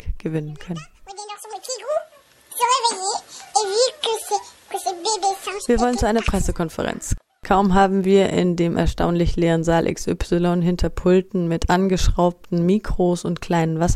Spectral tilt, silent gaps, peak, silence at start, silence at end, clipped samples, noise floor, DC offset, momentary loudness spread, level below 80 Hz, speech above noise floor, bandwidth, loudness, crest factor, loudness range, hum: -5 dB/octave; none; -2 dBFS; 0.05 s; 0 s; under 0.1%; -48 dBFS; under 0.1%; 13 LU; -30 dBFS; 29 dB; 14 kHz; -21 LUFS; 18 dB; 4 LU; none